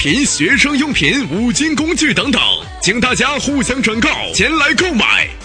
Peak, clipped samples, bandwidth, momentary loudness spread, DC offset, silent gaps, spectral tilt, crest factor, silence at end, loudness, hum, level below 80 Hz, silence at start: 0 dBFS; under 0.1%; 10 kHz; 4 LU; under 0.1%; none; -3 dB/octave; 14 dB; 0 s; -13 LUFS; none; -34 dBFS; 0 s